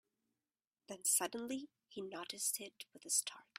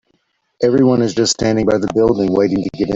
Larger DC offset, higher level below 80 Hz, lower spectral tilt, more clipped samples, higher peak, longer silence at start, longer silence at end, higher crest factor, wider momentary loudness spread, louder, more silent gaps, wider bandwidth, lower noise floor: neither; second, -88 dBFS vs -44 dBFS; second, -0.5 dB/octave vs -5.5 dB/octave; neither; second, -20 dBFS vs -2 dBFS; first, 0.9 s vs 0.6 s; first, 0.15 s vs 0 s; first, 22 dB vs 12 dB; first, 18 LU vs 4 LU; second, -38 LUFS vs -15 LUFS; neither; first, 16 kHz vs 7.8 kHz; first, under -90 dBFS vs -64 dBFS